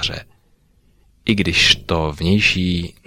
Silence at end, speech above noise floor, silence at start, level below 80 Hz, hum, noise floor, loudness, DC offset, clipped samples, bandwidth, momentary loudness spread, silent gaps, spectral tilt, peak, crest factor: 0.15 s; 39 dB; 0 s; -36 dBFS; 50 Hz at -40 dBFS; -56 dBFS; -16 LUFS; under 0.1%; under 0.1%; 16 kHz; 11 LU; none; -4 dB/octave; 0 dBFS; 18 dB